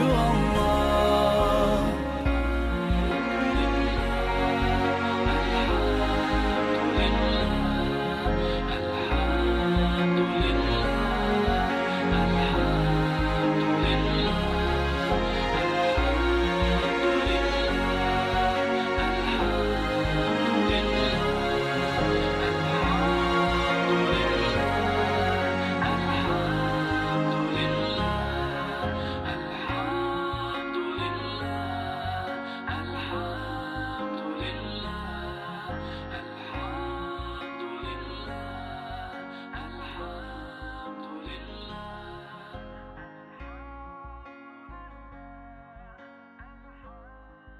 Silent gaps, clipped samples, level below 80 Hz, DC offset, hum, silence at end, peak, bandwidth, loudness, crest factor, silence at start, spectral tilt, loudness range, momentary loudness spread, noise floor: none; under 0.1%; -34 dBFS; under 0.1%; none; 0 s; -10 dBFS; 15 kHz; -26 LUFS; 16 dB; 0 s; -6 dB/octave; 15 LU; 16 LU; -49 dBFS